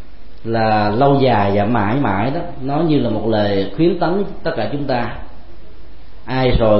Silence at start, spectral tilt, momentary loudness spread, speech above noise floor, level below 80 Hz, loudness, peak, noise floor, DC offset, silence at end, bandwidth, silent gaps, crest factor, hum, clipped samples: 0 s; -12 dB/octave; 9 LU; 23 dB; -34 dBFS; -17 LUFS; -2 dBFS; -39 dBFS; 6%; 0 s; 5.8 kHz; none; 16 dB; none; under 0.1%